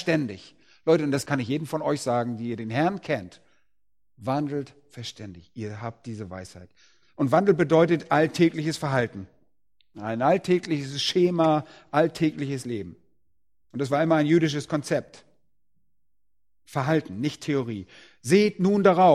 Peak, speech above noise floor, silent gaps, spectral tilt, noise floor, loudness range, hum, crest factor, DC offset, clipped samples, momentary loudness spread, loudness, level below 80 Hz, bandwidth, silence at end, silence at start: -6 dBFS; 58 dB; none; -6 dB/octave; -82 dBFS; 7 LU; none; 20 dB; under 0.1%; under 0.1%; 17 LU; -25 LUFS; -64 dBFS; 14.5 kHz; 0 s; 0 s